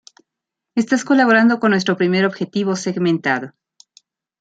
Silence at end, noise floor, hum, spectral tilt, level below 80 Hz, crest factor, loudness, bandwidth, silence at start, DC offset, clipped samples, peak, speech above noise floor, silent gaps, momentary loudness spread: 0.9 s; -83 dBFS; none; -5.5 dB/octave; -66 dBFS; 16 dB; -17 LUFS; 9.2 kHz; 0.75 s; under 0.1%; under 0.1%; -2 dBFS; 66 dB; none; 10 LU